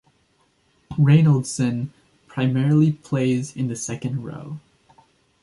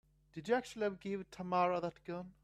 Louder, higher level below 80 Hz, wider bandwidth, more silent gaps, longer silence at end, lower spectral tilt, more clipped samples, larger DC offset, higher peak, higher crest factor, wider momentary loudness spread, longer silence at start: first, -21 LUFS vs -38 LUFS; first, -58 dBFS vs -72 dBFS; second, 11.5 kHz vs 13 kHz; neither; first, 0.85 s vs 0.1 s; about the same, -7 dB/octave vs -6 dB/octave; neither; neither; first, -4 dBFS vs -22 dBFS; about the same, 16 dB vs 18 dB; first, 18 LU vs 12 LU; first, 0.9 s vs 0.35 s